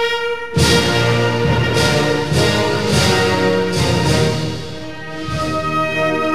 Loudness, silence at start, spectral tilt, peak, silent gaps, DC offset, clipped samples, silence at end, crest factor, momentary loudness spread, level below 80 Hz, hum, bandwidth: -16 LUFS; 0 s; -4.5 dB/octave; -4 dBFS; none; 2%; under 0.1%; 0 s; 14 dB; 11 LU; -34 dBFS; none; 14.5 kHz